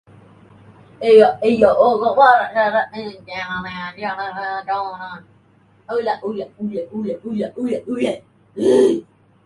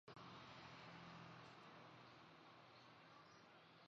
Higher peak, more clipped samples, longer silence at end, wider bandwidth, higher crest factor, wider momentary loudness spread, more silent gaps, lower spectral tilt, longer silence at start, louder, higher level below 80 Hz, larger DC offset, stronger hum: first, 0 dBFS vs -48 dBFS; neither; first, 0.45 s vs 0 s; first, 11.5 kHz vs 7.4 kHz; about the same, 18 dB vs 14 dB; first, 16 LU vs 6 LU; neither; first, -5.5 dB/octave vs -3 dB/octave; first, 1 s vs 0.05 s; first, -18 LUFS vs -62 LUFS; first, -58 dBFS vs -86 dBFS; neither; neither